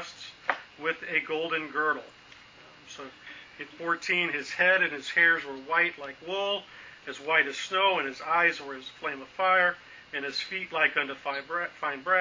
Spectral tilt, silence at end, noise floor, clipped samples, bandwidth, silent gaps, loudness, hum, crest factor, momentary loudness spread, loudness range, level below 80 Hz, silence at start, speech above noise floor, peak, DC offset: -2.5 dB/octave; 0 s; -53 dBFS; under 0.1%; 7.6 kHz; none; -27 LUFS; none; 22 dB; 19 LU; 6 LU; -72 dBFS; 0 s; 24 dB; -8 dBFS; under 0.1%